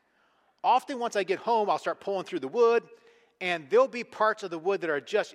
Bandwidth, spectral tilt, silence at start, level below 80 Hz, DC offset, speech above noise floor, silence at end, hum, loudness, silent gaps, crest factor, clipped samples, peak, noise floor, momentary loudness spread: 12 kHz; -4 dB/octave; 0.65 s; -82 dBFS; under 0.1%; 40 dB; 0.05 s; none; -28 LUFS; none; 16 dB; under 0.1%; -12 dBFS; -68 dBFS; 8 LU